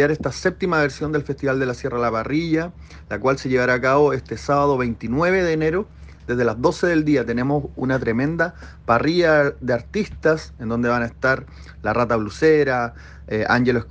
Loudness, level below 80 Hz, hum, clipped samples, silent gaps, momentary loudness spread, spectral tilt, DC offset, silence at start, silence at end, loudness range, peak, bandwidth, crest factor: -20 LUFS; -42 dBFS; none; under 0.1%; none; 9 LU; -6.5 dB/octave; under 0.1%; 0 s; 0 s; 2 LU; -4 dBFS; 9 kHz; 16 dB